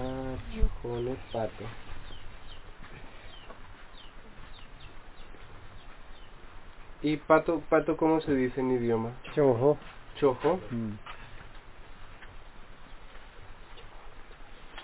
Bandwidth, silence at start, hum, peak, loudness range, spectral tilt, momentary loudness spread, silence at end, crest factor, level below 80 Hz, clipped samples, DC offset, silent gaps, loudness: 4 kHz; 0 s; none; -6 dBFS; 23 LU; -6 dB/octave; 26 LU; 0 s; 26 dB; -44 dBFS; under 0.1%; under 0.1%; none; -29 LUFS